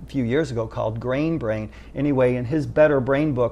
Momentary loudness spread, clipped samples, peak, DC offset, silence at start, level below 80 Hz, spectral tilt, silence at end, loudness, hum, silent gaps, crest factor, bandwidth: 9 LU; under 0.1%; -6 dBFS; under 0.1%; 0 s; -42 dBFS; -8 dB/octave; 0 s; -22 LUFS; none; none; 16 dB; 10.5 kHz